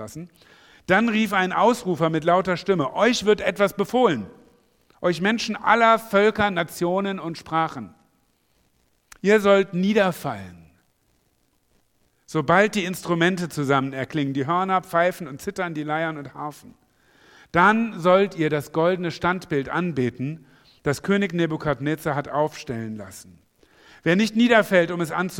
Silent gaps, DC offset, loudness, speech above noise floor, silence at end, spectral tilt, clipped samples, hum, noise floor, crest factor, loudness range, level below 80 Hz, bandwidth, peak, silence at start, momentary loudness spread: none; under 0.1%; -22 LUFS; 45 dB; 0 s; -5.5 dB/octave; under 0.1%; none; -66 dBFS; 20 dB; 5 LU; -56 dBFS; 17.5 kHz; -2 dBFS; 0 s; 14 LU